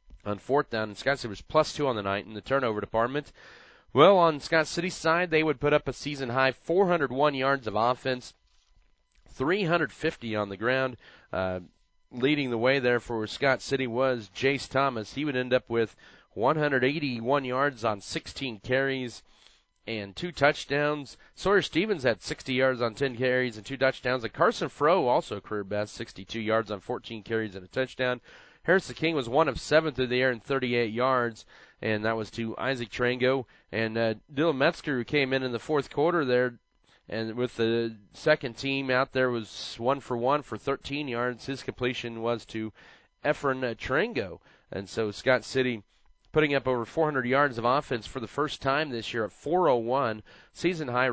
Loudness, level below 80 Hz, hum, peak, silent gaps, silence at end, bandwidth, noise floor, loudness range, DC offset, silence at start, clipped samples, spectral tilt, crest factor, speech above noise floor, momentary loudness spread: -28 LUFS; -56 dBFS; none; -6 dBFS; none; 0 s; 8 kHz; -64 dBFS; 5 LU; under 0.1%; 0.1 s; under 0.1%; -5.5 dB/octave; 22 dB; 36 dB; 10 LU